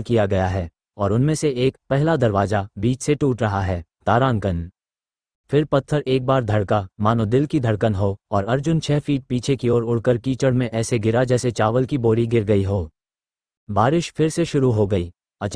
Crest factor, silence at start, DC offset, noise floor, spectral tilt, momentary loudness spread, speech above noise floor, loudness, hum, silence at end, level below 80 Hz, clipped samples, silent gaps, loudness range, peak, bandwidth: 18 dB; 0 s; under 0.1%; under -90 dBFS; -7 dB/octave; 6 LU; over 71 dB; -20 LUFS; none; 0 s; -44 dBFS; under 0.1%; 5.35-5.44 s, 13.57-13.67 s; 2 LU; -2 dBFS; 10.5 kHz